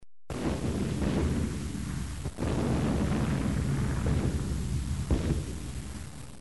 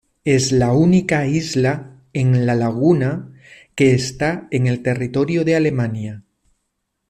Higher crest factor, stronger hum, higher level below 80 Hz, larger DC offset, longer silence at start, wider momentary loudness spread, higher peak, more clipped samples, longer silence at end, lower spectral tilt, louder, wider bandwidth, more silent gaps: about the same, 16 dB vs 14 dB; neither; first, -36 dBFS vs -48 dBFS; first, 0.5% vs under 0.1%; second, 0 s vs 0.25 s; about the same, 10 LU vs 10 LU; second, -14 dBFS vs -4 dBFS; neither; second, 0 s vs 0.9 s; about the same, -6.5 dB/octave vs -6.5 dB/octave; second, -31 LUFS vs -18 LUFS; first, 11.5 kHz vs 9.6 kHz; neither